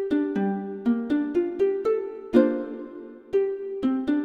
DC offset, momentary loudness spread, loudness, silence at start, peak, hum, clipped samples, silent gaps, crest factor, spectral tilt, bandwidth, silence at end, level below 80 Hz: under 0.1%; 11 LU; -25 LUFS; 0 s; -6 dBFS; none; under 0.1%; none; 20 dB; -8.5 dB/octave; 6.4 kHz; 0 s; -60 dBFS